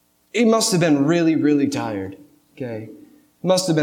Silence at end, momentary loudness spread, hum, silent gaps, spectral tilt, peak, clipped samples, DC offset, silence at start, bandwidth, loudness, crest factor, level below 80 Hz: 0 s; 17 LU; none; none; -5 dB/octave; -6 dBFS; under 0.1%; under 0.1%; 0.35 s; 16.5 kHz; -19 LUFS; 14 dB; -66 dBFS